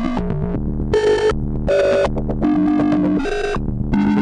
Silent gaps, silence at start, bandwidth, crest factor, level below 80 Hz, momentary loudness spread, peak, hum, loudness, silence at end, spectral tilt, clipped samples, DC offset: none; 0 s; 10.5 kHz; 12 dB; -28 dBFS; 6 LU; -6 dBFS; none; -18 LUFS; 0 s; -7.5 dB/octave; under 0.1%; under 0.1%